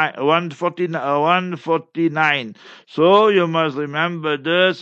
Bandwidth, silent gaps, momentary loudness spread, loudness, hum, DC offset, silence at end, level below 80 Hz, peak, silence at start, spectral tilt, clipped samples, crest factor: 7.8 kHz; none; 9 LU; -18 LUFS; none; under 0.1%; 0 s; -76 dBFS; -2 dBFS; 0 s; -6.5 dB/octave; under 0.1%; 16 dB